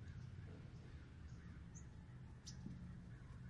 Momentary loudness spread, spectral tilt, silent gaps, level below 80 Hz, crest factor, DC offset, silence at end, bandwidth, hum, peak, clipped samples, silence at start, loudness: 4 LU; -5.5 dB/octave; none; -62 dBFS; 16 dB; under 0.1%; 0 s; 10.5 kHz; none; -38 dBFS; under 0.1%; 0 s; -57 LUFS